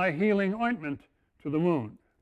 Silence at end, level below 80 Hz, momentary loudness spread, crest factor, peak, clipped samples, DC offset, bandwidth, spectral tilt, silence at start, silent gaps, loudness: 0.25 s; -64 dBFS; 15 LU; 16 dB; -14 dBFS; under 0.1%; under 0.1%; 8.2 kHz; -8.5 dB/octave; 0 s; none; -29 LUFS